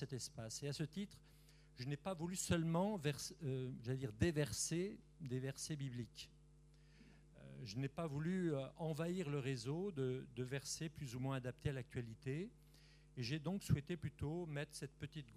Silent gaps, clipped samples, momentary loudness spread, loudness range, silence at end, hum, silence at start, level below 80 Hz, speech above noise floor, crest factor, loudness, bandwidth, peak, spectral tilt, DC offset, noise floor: none; under 0.1%; 11 LU; 5 LU; 0 s; none; 0 s; -66 dBFS; 23 dB; 22 dB; -45 LUFS; 15 kHz; -24 dBFS; -5.5 dB/octave; under 0.1%; -66 dBFS